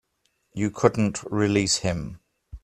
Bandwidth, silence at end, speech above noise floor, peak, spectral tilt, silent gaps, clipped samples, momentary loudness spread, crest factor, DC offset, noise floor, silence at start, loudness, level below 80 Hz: 13.5 kHz; 0.05 s; 48 dB; -2 dBFS; -4.5 dB/octave; none; under 0.1%; 12 LU; 24 dB; under 0.1%; -72 dBFS; 0.55 s; -24 LUFS; -48 dBFS